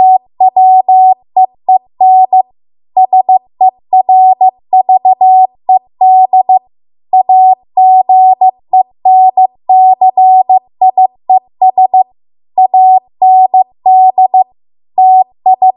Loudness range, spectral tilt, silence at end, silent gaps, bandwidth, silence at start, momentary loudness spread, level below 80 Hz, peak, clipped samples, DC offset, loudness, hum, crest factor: 2 LU; -9.5 dB/octave; 0.05 s; none; 1.1 kHz; 0 s; 6 LU; -66 dBFS; 0 dBFS; under 0.1%; under 0.1%; -8 LUFS; none; 6 dB